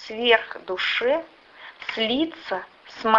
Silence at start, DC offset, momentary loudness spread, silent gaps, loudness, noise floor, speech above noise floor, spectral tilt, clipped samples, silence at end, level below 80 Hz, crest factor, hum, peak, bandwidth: 0 s; under 0.1%; 18 LU; none; -24 LUFS; -44 dBFS; 20 dB; -4 dB/octave; under 0.1%; 0 s; -62 dBFS; 22 dB; none; -4 dBFS; 7.4 kHz